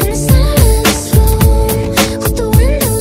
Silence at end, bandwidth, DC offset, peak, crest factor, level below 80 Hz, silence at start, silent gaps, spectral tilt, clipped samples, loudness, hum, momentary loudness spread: 0 s; 16.5 kHz; under 0.1%; 0 dBFS; 10 dB; -14 dBFS; 0 s; none; -5 dB/octave; 0.3%; -11 LUFS; none; 4 LU